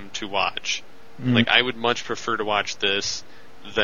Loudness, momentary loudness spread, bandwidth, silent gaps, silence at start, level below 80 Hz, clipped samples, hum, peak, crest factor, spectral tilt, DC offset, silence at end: -23 LUFS; 11 LU; 7.4 kHz; none; 0 s; -56 dBFS; under 0.1%; none; 0 dBFS; 24 dB; -3.5 dB/octave; 2%; 0 s